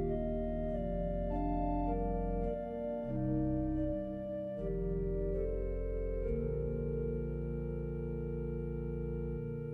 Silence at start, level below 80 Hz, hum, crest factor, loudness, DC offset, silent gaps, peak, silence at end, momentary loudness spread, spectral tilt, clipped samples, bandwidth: 0 s; -42 dBFS; none; 12 dB; -37 LUFS; under 0.1%; none; -24 dBFS; 0 s; 4 LU; -11.5 dB/octave; under 0.1%; 3.7 kHz